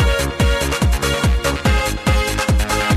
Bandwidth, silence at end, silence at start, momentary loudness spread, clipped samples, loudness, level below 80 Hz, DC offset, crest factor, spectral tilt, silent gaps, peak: 15.5 kHz; 0 s; 0 s; 1 LU; under 0.1%; -17 LUFS; -20 dBFS; under 0.1%; 14 dB; -4.5 dB/octave; none; -2 dBFS